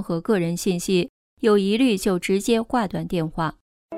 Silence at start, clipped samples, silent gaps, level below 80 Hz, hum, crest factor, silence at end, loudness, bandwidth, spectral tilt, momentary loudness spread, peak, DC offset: 0 s; under 0.1%; 1.09-1.37 s, 3.61-3.89 s; -50 dBFS; none; 16 dB; 0 s; -22 LUFS; 16 kHz; -5.5 dB/octave; 7 LU; -6 dBFS; under 0.1%